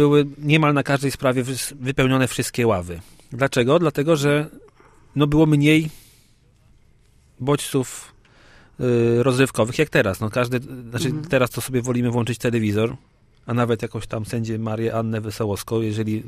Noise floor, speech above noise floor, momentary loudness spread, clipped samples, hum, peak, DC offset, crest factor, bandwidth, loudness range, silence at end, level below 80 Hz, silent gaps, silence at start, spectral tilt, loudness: -55 dBFS; 35 dB; 10 LU; under 0.1%; none; -2 dBFS; under 0.1%; 20 dB; 15.5 kHz; 5 LU; 0 s; -46 dBFS; none; 0 s; -6 dB/octave; -21 LUFS